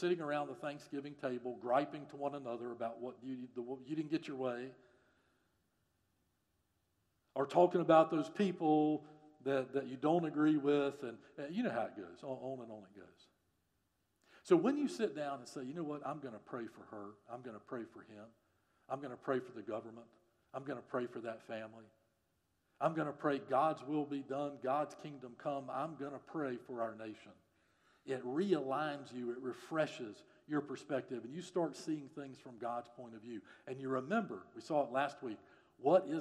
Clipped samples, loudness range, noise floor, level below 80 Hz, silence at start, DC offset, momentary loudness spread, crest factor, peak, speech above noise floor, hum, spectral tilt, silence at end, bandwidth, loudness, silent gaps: under 0.1%; 12 LU; -82 dBFS; -88 dBFS; 0 s; under 0.1%; 18 LU; 24 dB; -16 dBFS; 43 dB; none; -6.5 dB/octave; 0 s; 11.5 kHz; -39 LUFS; none